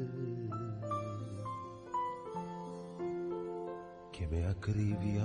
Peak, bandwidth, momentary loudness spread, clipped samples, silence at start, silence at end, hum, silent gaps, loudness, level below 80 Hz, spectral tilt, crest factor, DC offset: -22 dBFS; 10 kHz; 10 LU; under 0.1%; 0 s; 0 s; none; none; -40 LUFS; -56 dBFS; -8 dB/octave; 16 dB; under 0.1%